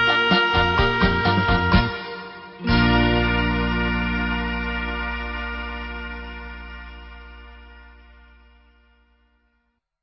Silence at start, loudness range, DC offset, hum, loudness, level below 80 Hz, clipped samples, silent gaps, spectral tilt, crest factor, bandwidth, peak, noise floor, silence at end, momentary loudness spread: 0 s; 19 LU; under 0.1%; none; -21 LUFS; -30 dBFS; under 0.1%; none; -7 dB/octave; 18 dB; 6.4 kHz; -4 dBFS; -71 dBFS; 2.1 s; 20 LU